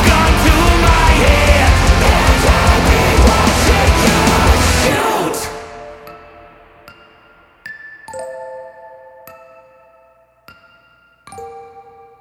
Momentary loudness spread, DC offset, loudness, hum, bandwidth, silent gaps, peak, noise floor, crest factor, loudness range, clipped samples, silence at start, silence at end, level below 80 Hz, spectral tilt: 22 LU; under 0.1%; -11 LUFS; none; 17 kHz; none; 0 dBFS; -51 dBFS; 14 dB; 23 LU; under 0.1%; 0 s; 0.4 s; -18 dBFS; -4.5 dB/octave